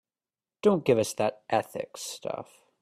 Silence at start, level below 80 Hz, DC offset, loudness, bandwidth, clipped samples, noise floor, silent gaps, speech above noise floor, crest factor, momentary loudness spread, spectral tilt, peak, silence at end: 0.65 s; -68 dBFS; under 0.1%; -28 LUFS; 15 kHz; under 0.1%; under -90 dBFS; none; over 62 dB; 20 dB; 12 LU; -5 dB/octave; -10 dBFS; 0.4 s